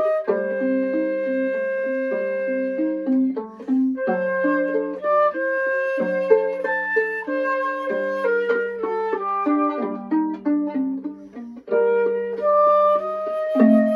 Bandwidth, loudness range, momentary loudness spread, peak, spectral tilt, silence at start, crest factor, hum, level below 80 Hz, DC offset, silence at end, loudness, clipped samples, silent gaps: 6.2 kHz; 2 LU; 7 LU; -2 dBFS; -8 dB/octave; 0 s; 18 dB; none; -70 dBFS; under 0.1%; 0 s; -22 LUFS; under 0.1%; none